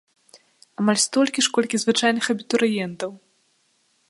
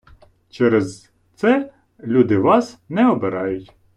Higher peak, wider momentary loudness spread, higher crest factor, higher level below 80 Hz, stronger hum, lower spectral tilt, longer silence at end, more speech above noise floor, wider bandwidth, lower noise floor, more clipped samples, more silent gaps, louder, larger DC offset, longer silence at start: about the same, -4 dBFS vs -4 dBFS; about the same, 12 LU vs 14 LU; about the same, 20 dB vs 16 dB; second, -70 dBFS vs -56 dBFS; neither; second, -3 dB/octave vs -7 dB/octave; first, 0.95 s vs 0.3 s; first, 44 dB vs 33 dB; about the same, 11.5 kHz vs 10.5 kHz; first, -66 dBFS vs -50 dBFS; neither; neither; second, -21 LUFS vs -18 LUFS; neither; first, 0.8 s vs 0.55 s